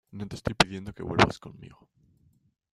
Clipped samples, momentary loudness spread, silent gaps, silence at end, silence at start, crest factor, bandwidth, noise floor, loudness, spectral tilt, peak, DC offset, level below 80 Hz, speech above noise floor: under 0.1%; 17 LU; none; 1 s; 0.15 s; 28 dB; 13 kHz; -67 dBFS; -27 LUFS; -4.5 dB/octave; -2 dBFS; under 0.1%; -50 dBFS; 38 dB